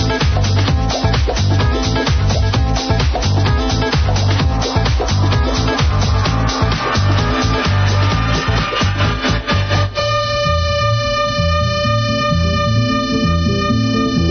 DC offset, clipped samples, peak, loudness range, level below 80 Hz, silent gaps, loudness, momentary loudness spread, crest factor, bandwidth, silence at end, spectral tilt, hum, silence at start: under 0.1%; under 0.1%; -2 dBFS; 0 LU; -22 dBFS; none; -15 LUFS; 1 LU; 12 dB; 6.6 kHz; 0 s; -5.5 dB/octave; none; 0 s